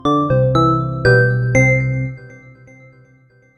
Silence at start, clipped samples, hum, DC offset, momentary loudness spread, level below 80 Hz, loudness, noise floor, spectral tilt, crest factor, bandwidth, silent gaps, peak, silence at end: 0.05 s; under 0.1%; none; under 0.1%; 10 LU; -38 dBFS; -15 LUFS; -51 dBFS; -7 dB/octave; 16 dB; 8.2 kHz; none; 0 dBFS; 1.2 s